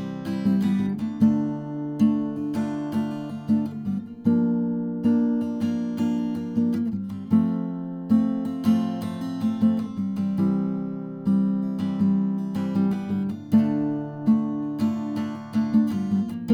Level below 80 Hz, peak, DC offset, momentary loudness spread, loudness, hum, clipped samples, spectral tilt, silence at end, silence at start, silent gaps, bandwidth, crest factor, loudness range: -64 dBFS; -8 dBFS; under 0.1%; 7 LU; -25 LUFS; none; under 0.1%; -9 dB/octave; 0 s; 0 s; none; 9.4 kHz; 16 dB; 1 LU